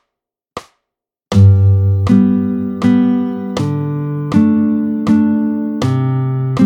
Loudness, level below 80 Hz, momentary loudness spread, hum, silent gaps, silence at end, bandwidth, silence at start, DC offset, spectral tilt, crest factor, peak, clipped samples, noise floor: -14 LUFS; -46 dBFS; 9 LU; none; none; 0 s; 8.2 kHz; 0.55 s; under 0.1%; -9 dB/octave; 14 dB; 0 dBFS; under 0.1%; -81 dBFS